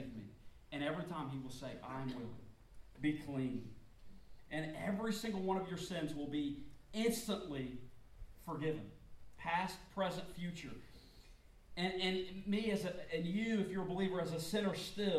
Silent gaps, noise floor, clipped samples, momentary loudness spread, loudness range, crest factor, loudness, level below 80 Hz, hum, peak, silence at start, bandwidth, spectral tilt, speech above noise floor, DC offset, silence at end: none; -61 dBFS; under 0.1%; 14 LU; 5 LU; 18 dB; -41 LUFS; -62 dBFS; none; -24 dBFS; 0 s; 16 kHz; -5.5 dB/octave; 21 dB; under 0.1%; 0 s